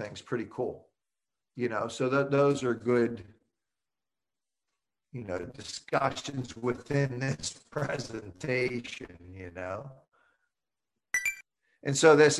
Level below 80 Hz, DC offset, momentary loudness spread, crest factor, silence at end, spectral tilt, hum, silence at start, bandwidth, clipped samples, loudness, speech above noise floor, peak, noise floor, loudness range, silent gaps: -62 dBFS; under 0.1%; 18 LU; 24 dB; 0 s; -5 dB/octave; none; 0 s; 12.5 kHz; under 0.1%; -30 LUFS; over 61 dB; -8 dBFS; under -90 dBFS; 7 LU; none